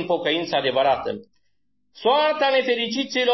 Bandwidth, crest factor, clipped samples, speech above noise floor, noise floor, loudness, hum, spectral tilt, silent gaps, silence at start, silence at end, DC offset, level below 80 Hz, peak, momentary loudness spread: 6.2 kHz; 14 dB; under 0.1%; 53 dB; -75 dBFS; -21 LUFS; none; -4 dB/octave; none; 0 s; 0 s; under 0.1%; -64 dBFS; -8 dBFS; 7 LU